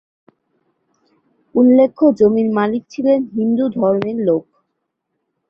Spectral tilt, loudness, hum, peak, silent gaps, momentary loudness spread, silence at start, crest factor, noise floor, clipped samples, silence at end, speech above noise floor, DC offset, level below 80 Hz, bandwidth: -8.5 dB/octave; -15 LUFS; none; -2 dBFS; none; 8 LU; 1.55 s; 16 dB; -74 dBFS; under 0.1%; 1.1 s; 59 dB; under 0.1%; -60 dBFS; 6.6 kHz